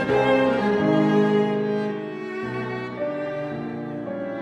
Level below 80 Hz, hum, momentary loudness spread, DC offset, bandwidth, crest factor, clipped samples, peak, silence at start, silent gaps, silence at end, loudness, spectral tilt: -58 dBFS; none; 12 LU; under 0.1%; 9.6 kHz; 16 dB; under 0.1%; -8 dBFS; 0 s; none; 0 s; -23 LUFS; -7.5 dB/octave